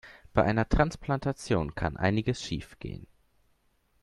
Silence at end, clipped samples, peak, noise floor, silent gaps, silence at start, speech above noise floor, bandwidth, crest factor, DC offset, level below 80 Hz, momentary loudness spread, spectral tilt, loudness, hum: 1 s; under 0.1%; -8 dBFS; -70 dBFS; none; 0.05 s; 41 dB; 12 kHz; 22 dB; under 0.1%; -42 dBFS; 15 LU; -6.5 dB/octave; -29 LUFS; none